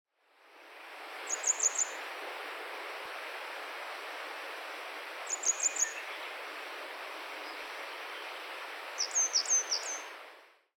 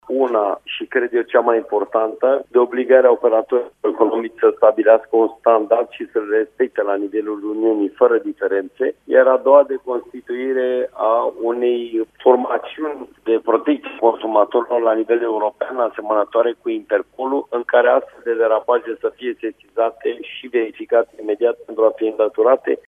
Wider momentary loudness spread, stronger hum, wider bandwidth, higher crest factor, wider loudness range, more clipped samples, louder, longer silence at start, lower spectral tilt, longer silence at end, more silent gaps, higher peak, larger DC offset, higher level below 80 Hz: first, 14 LU vs 10 LU; neither; first, 18 kHz vs 3.7 kHz; about the same, 20 dB vs 18 dB; first, 7 LU vs 4 LU; neither; second, -34 LUFS vs -18 LUFS; first, 0.45 s vs 0.1 s; second, 4.5 dB/octave vs -6 dB/octave; first, 0.25 s vs 0.1 s; neither; second, -18 dBFS vs 0 dBFS; neither; second, under -90 dBFS vs -68 dBFS